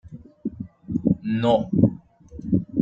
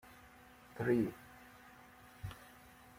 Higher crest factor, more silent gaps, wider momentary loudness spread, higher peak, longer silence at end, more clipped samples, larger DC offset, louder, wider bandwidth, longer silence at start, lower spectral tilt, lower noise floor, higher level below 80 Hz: about the same, 18 dB vs 22 dB; neither; second, 18 LU vs 24 LU; first, -4 dBFS vs -22 dBFS; second, 0 s vs 0.5 s; neither; neither; first, -23 LUFS vs -39 LUFS; second, 7.6 kHz vs 16.5 kHz; about the same, 0.05 s vs 0.05 s; first, -9.5 dB/octave vs -7.5 dB/octave; second, -42 dBFS vs -60 dBFS; first, -48 dBFS vs -66 dBFS